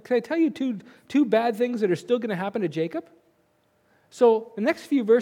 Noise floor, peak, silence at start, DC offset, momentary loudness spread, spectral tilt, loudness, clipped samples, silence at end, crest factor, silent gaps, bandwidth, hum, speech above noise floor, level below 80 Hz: -66 dBFS; -6 dBFS; 0.1 s; under 0.1%; 9 LU; -6.5 dB/octave; -24 LUFS; under 0.1%; 0 s; 18 dB; none; 15.5 kHz; none; 43 dB; -78 dBFS